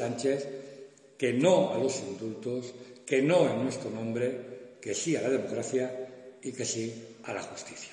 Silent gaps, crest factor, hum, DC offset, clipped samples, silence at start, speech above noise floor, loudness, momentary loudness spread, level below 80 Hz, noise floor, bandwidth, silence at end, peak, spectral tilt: none; 20 dB; none; under 0.1%; under 0.1%; 0 s; 21 dB; -30 LUFS; 18 LU; -78 dBFS; -50 dBFS; 11 kHz; 0 s; -10 dBFS; -4.5 dB/octave